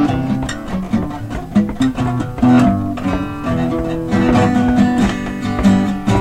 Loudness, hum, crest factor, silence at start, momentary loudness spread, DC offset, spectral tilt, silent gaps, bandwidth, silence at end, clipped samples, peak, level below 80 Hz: -16 LUFS; none; 12 dB; 0 s; 8 LU; under 0.1%; -7 dB/octave; none; 12 kHz; 0 s; under 0.1%; -2 dBFS; -30 dBFS